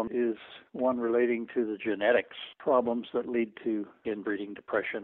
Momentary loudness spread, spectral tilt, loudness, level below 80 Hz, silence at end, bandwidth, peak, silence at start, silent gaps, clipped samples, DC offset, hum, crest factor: 9 LU; -3.5 dB/octave; -30 LUFS; -70 dBFS; 0 s; 4.1 kHz; -12 dBFS; 0 s; none; under 0.1%; under 0.1%; none; 18 dB